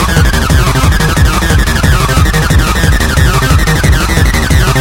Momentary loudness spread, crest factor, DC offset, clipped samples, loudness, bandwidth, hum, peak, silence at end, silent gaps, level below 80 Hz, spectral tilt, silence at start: 1 LU; 8 dB; under 0.1%; 1%; -9 LUFS; 17 kHz; none; 0 dBFS; 0 s; none; -12 dBFS; -4.5 dB/octave; 0 s